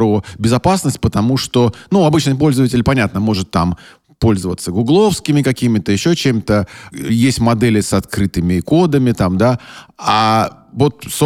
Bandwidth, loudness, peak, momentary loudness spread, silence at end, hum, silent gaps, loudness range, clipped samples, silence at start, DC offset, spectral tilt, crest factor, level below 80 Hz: 16.5 kHz; -15 LUFS; -2 dBFS; 6 LU; 0 s; none; none; 1 LU; under 0.1%; 0 s; under 0.1%; -6 dB/octave; 14 dB; -36 dBFS